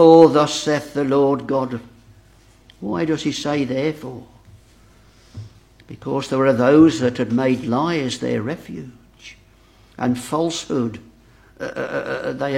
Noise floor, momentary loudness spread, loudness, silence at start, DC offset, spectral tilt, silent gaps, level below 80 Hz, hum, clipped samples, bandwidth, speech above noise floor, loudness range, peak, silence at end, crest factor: -51 dBFS; 20 LU; -19 LUFS; 0 s; under 0.1%; -6 dB/octave; none; -54 dBFS; none; under 0.1%; 13 kHz; 33 dB; 8 LU; 0 dBFS; 0 s; 20 dB